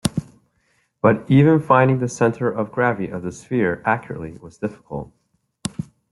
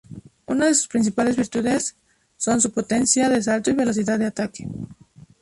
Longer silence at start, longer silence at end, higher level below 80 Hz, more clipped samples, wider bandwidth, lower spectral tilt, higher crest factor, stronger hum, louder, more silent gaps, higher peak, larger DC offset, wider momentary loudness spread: about the same, 0.05 s vs 0.1 s; second, 0.3 s vs 0.5 s; about the same, -52 dBFS vs -54 dBFS; neither; about the same, 12 kHz vs 11.5 kHz; first, -7 dB/octave vs -3.5 dB/octave; about the same, 20 dB vs 18 dB; neither; about the same, -20 LUFS vs -21 LUFS; neither; first, 0 dBFS vs -4 dBFS; neither; first, 18 LU vs 13 LU